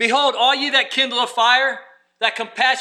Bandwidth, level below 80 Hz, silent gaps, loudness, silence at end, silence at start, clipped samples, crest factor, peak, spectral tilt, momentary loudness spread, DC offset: 13 kHz; -80 dBFS; none; -17 LUFS; 0 s; 0 s; under 0.1%; 16 dB; -2 dBFS; -0.5 dB/octave; 7 LU; under 0.1%